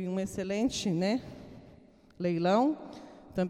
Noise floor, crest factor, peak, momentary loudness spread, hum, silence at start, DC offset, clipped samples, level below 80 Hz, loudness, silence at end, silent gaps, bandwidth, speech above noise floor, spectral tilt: -57 dBFS; 18 dB; -14 dBFS; 21 LU; none; 0 s; under 0.1%; under 0.1%; -60 dBFS; -31 LUFS; 0 s; none; 14 kHz; 27 dB; -6 dB/octave